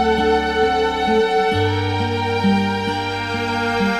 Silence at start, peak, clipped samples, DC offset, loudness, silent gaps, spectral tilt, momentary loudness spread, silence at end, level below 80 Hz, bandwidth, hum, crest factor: 0 s; -6 dBFS; under 0.1%; 0.2%; -18 LUFS; none; -6 dB/octave; 5 LU; 0 s; -40 dBFS; 13.5 kHz; none; 12 dB